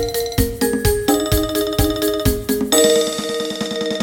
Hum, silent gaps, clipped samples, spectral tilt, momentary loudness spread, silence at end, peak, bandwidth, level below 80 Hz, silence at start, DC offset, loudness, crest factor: none; none; under 0.1%; -4 dB/octave; 8 LU; 0 s; 0 dBFS; 17 kHz; -28 dBFS; 0 s; under 0.1%; -18 LUFS; 18 dB